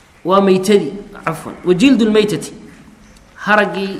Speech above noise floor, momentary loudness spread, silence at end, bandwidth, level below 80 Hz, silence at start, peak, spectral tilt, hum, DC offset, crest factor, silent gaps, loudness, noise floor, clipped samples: 29 dB; 13 LU; 0 s; 14.5 kHz; -48 dBFS; 0.25 s; 0 dBFS; -5.5 dB/octave; none; under 0.1%; 16 dB; none; -14 LUFS; -43 dBFS; under 0.1%